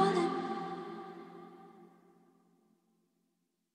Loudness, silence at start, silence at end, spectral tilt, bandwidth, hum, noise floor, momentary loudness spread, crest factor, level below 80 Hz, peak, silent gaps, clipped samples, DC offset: -37 LUFS; 0 s; 1.9 s; -6 dB/octave; 10.5 kHz; none; -81 dBFS; 24 LU; 22 dB; -84 dBFS; -16 dBFS; none; under 0.1%; under 0.1%